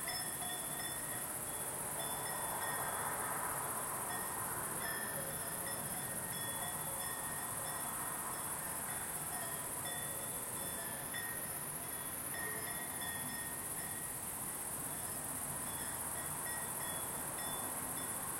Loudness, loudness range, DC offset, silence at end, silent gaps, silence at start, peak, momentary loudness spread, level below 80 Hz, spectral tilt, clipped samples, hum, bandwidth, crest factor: -39 LUFS; 2 LU; under 0.1%; 0 s; none; 0 s; -26 dBFS; 2 LU; -66 dBFS; -2 dB/octave; under 0.1%; none; 16.5 kHz; 16 dB